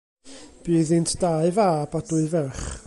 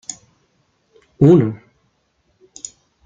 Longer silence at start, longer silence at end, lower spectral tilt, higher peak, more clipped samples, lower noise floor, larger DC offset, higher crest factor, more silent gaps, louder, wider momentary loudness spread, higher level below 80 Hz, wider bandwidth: first, 0.25 s vs 0.1 s; second, 0.05 s vs 1.5 s; second, -6 dB/octave vs -8 dB/octave; second, -10 dBFS vs -2 dBFS; neither; second, -45 dBFS vs -64 dBFS; neither; about the same, 14 dB vs 18 dB; neither; second, -23 LUFS vs -14 LUFS; second, 6 LU vs 23 LU; first, -44 dBFS vs -54 dBFS; first, 11.5 kHz vs 9.4 kHz